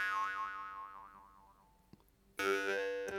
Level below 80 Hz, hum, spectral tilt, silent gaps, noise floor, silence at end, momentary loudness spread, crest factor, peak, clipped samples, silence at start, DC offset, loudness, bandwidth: -72 dBFS; 50 Hz at -75 dBFS; -2.5 dB/octave; none; -66 dBFS; 0 s; 20 LU; 20 dB; -20 dBFS; under 0.1%; 0 s; under 0.1%; -38 LUFS; 18 kHz